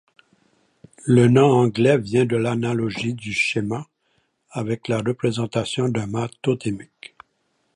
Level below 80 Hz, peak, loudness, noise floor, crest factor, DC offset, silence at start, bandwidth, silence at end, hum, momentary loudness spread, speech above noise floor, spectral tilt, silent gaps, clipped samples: -58 dBFS; -4 dBFS; -21 LUFS; -69 dBFS; 18 dB; under 0.1%; 1.05 s; 11 kHz; 0.9 s; none; 14 LU; 49 dB; -6.5 dB/octave; none; under 0.1%